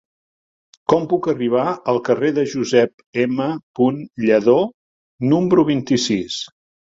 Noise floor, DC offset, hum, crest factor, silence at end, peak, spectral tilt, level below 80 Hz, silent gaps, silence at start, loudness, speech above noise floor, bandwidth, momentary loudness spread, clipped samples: under -90 dBFS; under 0.1%; none; 18 dB; 0.4 s; -2 dBFS; -5.5 dB/octave; -58 dBFS; 2.94-2.98 s, 3.06-3.13 s, 3.63-3.74 s, 4.74-5.18 s; 0.9 s; -18 LUFS; over 73 dB; 7.8 kHz; 9 LU; under 0.1%